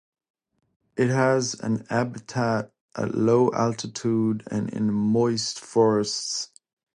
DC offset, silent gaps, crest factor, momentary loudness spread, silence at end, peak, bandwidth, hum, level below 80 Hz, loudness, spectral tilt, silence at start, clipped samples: under 0.1%; 2.81-2.89 s; 18 dB; 9 LU; 0.5 s; -8 dBFS; 11 kHz; none; -62 dBFS; -24 LUFS; -5.5 dB/octave; 0.95 s; under 0.1%